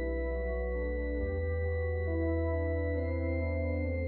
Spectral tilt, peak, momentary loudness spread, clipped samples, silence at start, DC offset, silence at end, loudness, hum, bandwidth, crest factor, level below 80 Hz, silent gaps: -9 dB/octave; -22 dBFS; 3 LU; under 0.1%; 0 s; under 0.1%; 0 s; -34 LUFS; none; 4.3 kHz; 10 dB; -36 dBFS; none